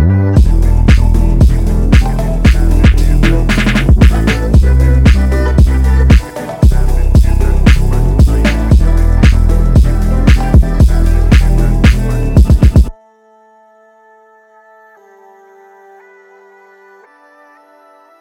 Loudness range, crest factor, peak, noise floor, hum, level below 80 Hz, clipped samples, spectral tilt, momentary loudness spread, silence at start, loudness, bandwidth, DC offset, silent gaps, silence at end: 3 LU; 8 dB; 0 dBFS; -46 dBFS; none; -10 dBFS; 0.3%; -7 dB/octave; 4 LU; 0 s; -10 LUFS; 13 kHz; under 0.1%; none; 5.3 s